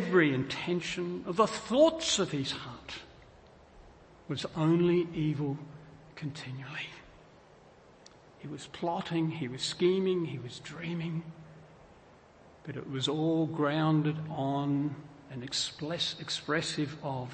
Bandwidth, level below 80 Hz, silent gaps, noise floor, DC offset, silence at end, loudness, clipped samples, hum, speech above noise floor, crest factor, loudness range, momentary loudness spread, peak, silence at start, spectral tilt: 8.8 kHz; -64 dBFS; none; -57 dBFS; under 0.1%; 0 s; -31 LUFS; under 0.1%; none; 26 dB; 20 dB; 8 LU; 17 LU; -12 dBFS; 0 s; -5 dB/octave